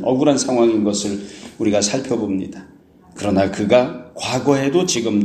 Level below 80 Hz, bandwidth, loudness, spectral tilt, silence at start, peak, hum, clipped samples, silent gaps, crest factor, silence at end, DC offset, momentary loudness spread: -54 dBFS; 13 kHz; -18 LUFS; -4.5 dB/octave; 0 s; 0 dBFS; none; under 0.1%; none; 18 dB; 0 s; under 0.1%; 11 LU